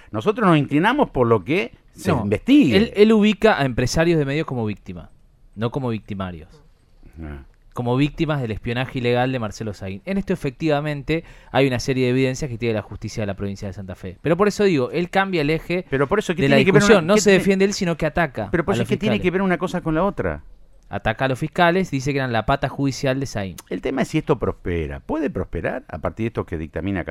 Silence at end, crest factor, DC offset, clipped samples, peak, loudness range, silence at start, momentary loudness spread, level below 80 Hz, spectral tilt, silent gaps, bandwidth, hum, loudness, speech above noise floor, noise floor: 0 s; 20 dB; under 0.1%; under 0.1%; 0 dBFS; 8 LU; 0.15 s; 14 LU; -40 dBFS; -6 dB/octave; none; 14.5 kHz; none; -20 LUFS; 28 dB; -48 dBFS